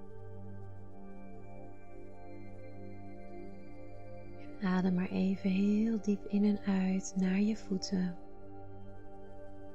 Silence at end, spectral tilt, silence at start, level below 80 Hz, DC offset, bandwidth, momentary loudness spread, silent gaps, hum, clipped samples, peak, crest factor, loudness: 0 s; -7 dB/octave; 0 s; -58 dBFS; 0.6%; 8 kHz; 21 LU; none; none; under 0.1%; -20 dBFS; 14 dB; -33 LUFS